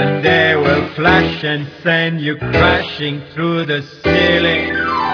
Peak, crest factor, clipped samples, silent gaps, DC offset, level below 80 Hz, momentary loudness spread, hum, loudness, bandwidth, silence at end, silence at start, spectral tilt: 0 dBFS; 14 dB; under 0.1%; none; under 0.1%; -36 dBFS; 8 LU; none; -14 LUFS; 5.4 kHz; 0 s; 0 s; -6.5 dB/octave